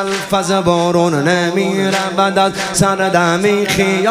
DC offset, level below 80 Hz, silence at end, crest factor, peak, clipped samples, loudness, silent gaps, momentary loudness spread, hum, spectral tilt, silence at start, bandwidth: under 0.1%; -46 dBFS; 0 s; 14 dB; 0 dBFS; under 0.1%; -14 LUFS; none; 2 LU; none; -4.5 dB/octave; 0 s; 15.5 kHz